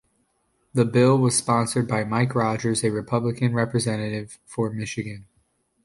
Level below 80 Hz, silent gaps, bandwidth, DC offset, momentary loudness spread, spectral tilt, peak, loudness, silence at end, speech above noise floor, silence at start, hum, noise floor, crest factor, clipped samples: -56 dBFS; none; 11.5 kHz; under 0.1%; 13 LU; -5.5 dB/octave; -6 dBFS; -23 LUFS; 0.6 s; 47 dB; 0.75 s; none; -69 dBFS; 18 dB; under 0.1%